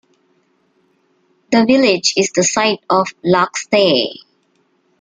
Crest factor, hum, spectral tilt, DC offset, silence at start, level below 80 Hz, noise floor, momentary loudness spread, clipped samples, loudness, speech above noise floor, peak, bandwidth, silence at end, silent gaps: 16 dB; none; -3.5 dB/octave; under 0.1%; 1.5 s; -58 dBFS; -61 dBFS; 5 LU; under 0.1%; -14 LUFS; 47 dB; 0 dBFS; 9.8 kHz; 0.9 s; none